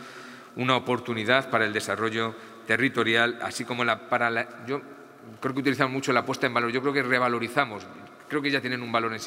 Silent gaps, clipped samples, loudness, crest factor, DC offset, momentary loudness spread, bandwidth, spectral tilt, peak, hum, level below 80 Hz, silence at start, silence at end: none; under 0.1%; -26 LUFS; 24 dB; under 0.1%; 11 LU; 16 kHz; -4.5 dB/octave; -4 dBFS; none; -74 dBFS; 0 s; 0 s